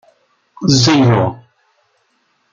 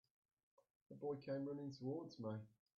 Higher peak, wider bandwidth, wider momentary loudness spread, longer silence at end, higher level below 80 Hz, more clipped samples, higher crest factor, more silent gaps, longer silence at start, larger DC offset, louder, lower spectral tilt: first, 0 dBFS vs -34 dBFS; about the same, 7.6 kHz vs 7 kHz; first, 11 LU vs 6 LU; first, 1.15 s vs 0.3 s; first, -50 dBFS vs -90 dBFS; neither; about the same, 16 dB vs 16 dB; neither; second, 0.6 s vs 0.9 s; neither; first, -13 LUFS vs -49 LUFS; second, -5 dB/octave vs -7.5 dB/octave